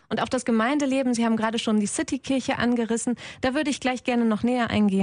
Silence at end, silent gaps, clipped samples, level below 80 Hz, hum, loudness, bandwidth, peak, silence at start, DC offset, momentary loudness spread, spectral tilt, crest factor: 0 s; none; under 0.1%; -56 dBFS; none; -24 LUFS; 10.5 kHz; -10 dBFS; 0.1 s; under 0.1%; 4 LU; -4.5 dB/octave; 14 dB